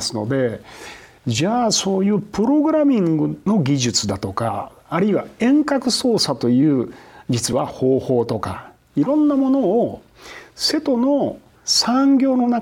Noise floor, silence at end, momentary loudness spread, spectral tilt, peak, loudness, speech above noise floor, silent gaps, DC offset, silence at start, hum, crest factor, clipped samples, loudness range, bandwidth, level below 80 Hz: -41 dBFS; 0 s; 14 LU; -5 dB/octave; -6 dBFS; -18 LUFS; 23 dB; none; under 0.1%; 0 s; none; 14 dB; under 0.1%; 2 LU; 16.5 kHz; -54 dBFS